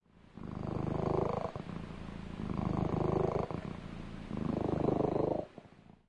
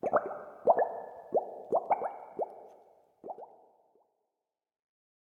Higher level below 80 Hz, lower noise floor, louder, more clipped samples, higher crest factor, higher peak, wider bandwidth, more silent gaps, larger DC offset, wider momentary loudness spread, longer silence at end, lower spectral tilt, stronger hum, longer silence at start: first, -50 dBFS vs -78 dBFS; second, -56 dBFS vs -89 dBFS; second, -36 LUFS vs -33 LUFS; neither; second, 18 dB vs 26 dB; second, -18 dBFS vs -10 dBFS; first, 10 kHz vs 3 kHz; neither; neither; second, 13 LU vs 19 LU; second, 0.3 s vs 1.9 s; about the same, -9 dB/octave vs -8 dB/octave; neither; first, 0.35 s vs 0.05 s